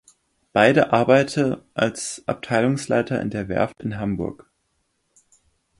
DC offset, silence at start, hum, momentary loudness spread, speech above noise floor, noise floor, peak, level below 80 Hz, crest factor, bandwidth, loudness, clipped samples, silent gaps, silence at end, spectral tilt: under 0.1%; 0.55 s; none; 11 LU; 50 dB; -71 dBFS; -2 dBFS; -52 dBFS; 20 dB; 11.5 kHz; -21 LUFS; under 0.1%; none; 1.45 s; -5.5 dB/octave